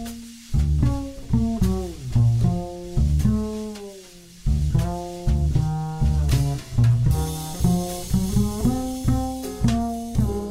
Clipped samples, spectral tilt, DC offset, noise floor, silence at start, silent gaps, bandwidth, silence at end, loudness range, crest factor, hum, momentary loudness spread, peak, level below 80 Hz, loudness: under 0.1%; -7 dB/octave; under 0.1%; -44 dBFS; 0 s; none; 16 kHz; 0 s; 2 LU; 14 dB; none; 9 LU; -8 dBFS; -28 dBFS; -23 LUFS